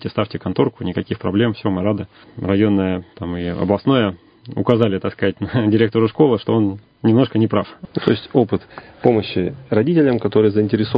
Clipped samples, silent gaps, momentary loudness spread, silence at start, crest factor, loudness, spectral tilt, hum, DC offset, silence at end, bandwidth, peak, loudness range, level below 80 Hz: under 0.1%; none; 9 LU; 0 s; 18 dB; -18 LUFS; -10 dB/octave; none; under 0.1%; 0 s; 5.2 kHz; 0 dBFS; 3 LU; -44 dBFS